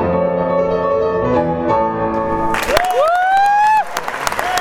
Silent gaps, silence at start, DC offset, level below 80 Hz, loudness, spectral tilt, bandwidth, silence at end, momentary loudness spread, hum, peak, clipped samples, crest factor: none; 0 s; under 0.1%; -38 dBFS; -15 LUFS; -5 dB/octave; over 20 kHz; 0 s; 6 LU; none; 0 dBFS; under 0.1%; 16 dB